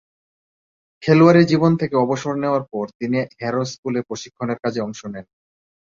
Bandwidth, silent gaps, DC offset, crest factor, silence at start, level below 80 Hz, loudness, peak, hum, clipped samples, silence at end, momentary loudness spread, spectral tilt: 7.6 kHz; 2.95-3.00 s, 3.78-3.83 s; under 0.1%; 18 dB; 1 s; -60 dBFS; -19 LUFS; -2 dBFS; none; under 0.1%; 0.75 s; 16 LU; -7 dB/octave